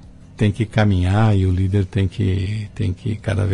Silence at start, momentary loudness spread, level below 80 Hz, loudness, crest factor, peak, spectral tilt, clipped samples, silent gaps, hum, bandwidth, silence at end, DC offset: 0.05 s; 8 LU; -38 dBFS; -19 LUFS; 12 dB; -6 dBFS; -8 dB/octave; under 0.1%; none; none; 10 kHz; 0 s; under 0.1%